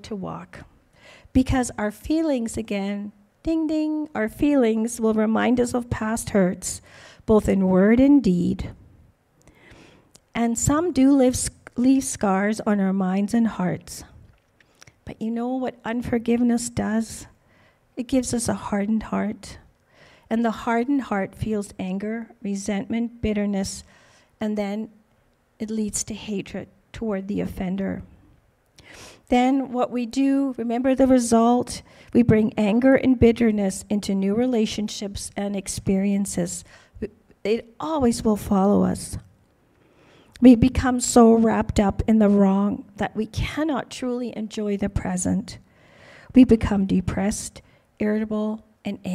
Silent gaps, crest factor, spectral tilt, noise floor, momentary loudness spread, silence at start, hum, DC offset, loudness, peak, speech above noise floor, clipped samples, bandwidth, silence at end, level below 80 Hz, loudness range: none; 20 dB; -6 dB/octave; -63 dBFS; 15 LU; 0.05 s; none; under 0.1%; -22 LUFS; -2 dBFS; 41 dB; under 0.1%; 14.5 kHz; 0 s; -42 dBFS; 9 LU